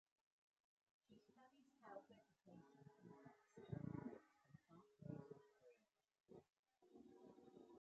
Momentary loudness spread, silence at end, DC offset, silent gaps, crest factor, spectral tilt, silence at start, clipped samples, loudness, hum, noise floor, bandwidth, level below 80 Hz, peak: 15 LU; 0 s; under 0.1%; 6.59-6.63 s; 26 dB; -8.5 dB/octave; 1.1 s; under 0.1%; -61 LUFS; none; -83 dBFS; 7.4 kHz; -84 dBFS; -36 dBFS